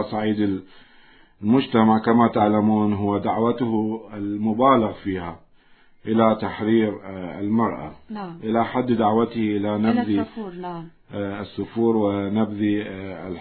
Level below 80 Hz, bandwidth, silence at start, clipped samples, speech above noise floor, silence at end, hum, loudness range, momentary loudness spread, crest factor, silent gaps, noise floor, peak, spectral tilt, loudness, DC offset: -58 dBFS; 4.5 kHz; 0 s; under 0.1%; 31 dB; 0 s; none; 4 LU; 15 LU; 20 dB; none; -53 dBFS; -2 dBFS; -11.5 dB/octave; -22 LUFS; under 0.1%